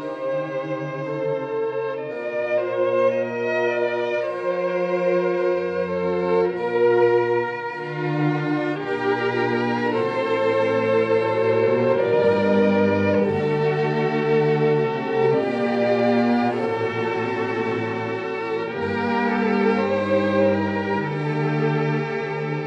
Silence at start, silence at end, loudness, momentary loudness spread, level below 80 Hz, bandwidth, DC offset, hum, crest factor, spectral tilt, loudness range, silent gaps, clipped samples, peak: 0 s; 0 s; -22 LUFS; 7 LU; -68 dBFS; 8 kHz; under 0.1%; none; 14 dB; -8 dB/octave; 4 LU; none; under 0.1%; -8 dBFS